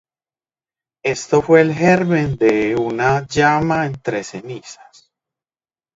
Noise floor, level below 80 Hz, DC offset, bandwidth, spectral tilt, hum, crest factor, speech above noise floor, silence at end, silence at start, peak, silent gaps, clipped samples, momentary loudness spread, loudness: under -90 dBFS; -48 dBFS; under 0.1%; 8 kHz; -6 dB/octave; none; 18 dB; over 74 dB; 1.2 s; 1.05 s; 0 dBFS; none; under 0.1%; 13 LU; -16 LUFS